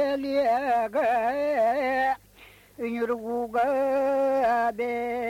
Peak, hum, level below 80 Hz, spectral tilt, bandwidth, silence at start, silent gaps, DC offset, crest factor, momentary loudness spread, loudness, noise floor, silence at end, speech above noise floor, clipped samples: -14 dBFS; none; -60 dBFS; -5 dB/octave; 16.5 kHz; 0 s; none; under 0.1%; 10 dB; 6 LU; -25 LUFS; -53 dBFS; 0 s; 28 dB; under 0.1%